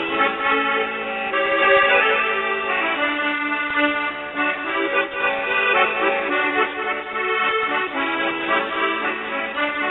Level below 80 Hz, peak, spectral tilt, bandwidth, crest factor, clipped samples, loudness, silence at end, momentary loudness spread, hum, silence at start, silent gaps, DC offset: -58 dBFS; -4 dBFS; -6 dB/octave; 4.2 kHz; 18 dB; under 0.1%; -19 LUFS; 0 s; 7 LU; none; 0 s; none; under 0.1%